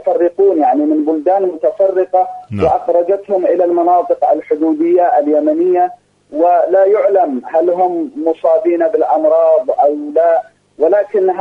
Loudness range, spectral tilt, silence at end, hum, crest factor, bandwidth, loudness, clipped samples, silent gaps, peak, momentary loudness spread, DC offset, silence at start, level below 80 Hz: 1 LU; -9 dB/octave; 0 s; none; 12 dB; 5.4 kHz; -13 LUFS; under 0.1%; none; -2 dBFS; 5 LU; under 0.1%; 0 s; -52 dBFS